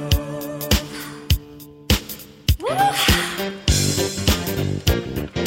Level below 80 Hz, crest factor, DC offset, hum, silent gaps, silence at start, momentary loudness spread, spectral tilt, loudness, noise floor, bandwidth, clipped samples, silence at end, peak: -28 dBFS; 18 dB; under 0.1%; none; none; 0 s; 12 LU; -4 dB/octave; -21 LUFS; -41 dBFS; 17 kHz; under 0.1%; 0 s; -2 dBFS